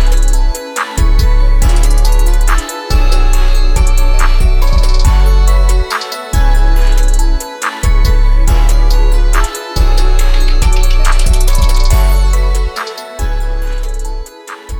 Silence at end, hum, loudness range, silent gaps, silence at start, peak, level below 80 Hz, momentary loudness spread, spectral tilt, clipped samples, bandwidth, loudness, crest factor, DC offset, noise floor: 0 s; none; 1 LU; none; 0 s; -2 dBFS; -8 dBFS; 8 LU; -4.5 dB/octave; under 0.1%; 16 kHz; -14 LUFS; 6 dB; under 0.1%; -28 dBFS